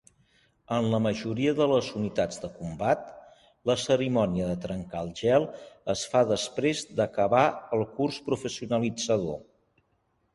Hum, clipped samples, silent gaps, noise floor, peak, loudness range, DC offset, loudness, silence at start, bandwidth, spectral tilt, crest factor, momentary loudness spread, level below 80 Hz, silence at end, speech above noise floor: none; under 0.1%; none; -72 dBFS; -8 dBFS; 2 LU; under 0.1%; -28 LUFS; 0.7 s; 11.5 kHz; -5.5 dB/octave; 20 dB; 10 LU; -56 dBFS; 0.9 s; 45 dB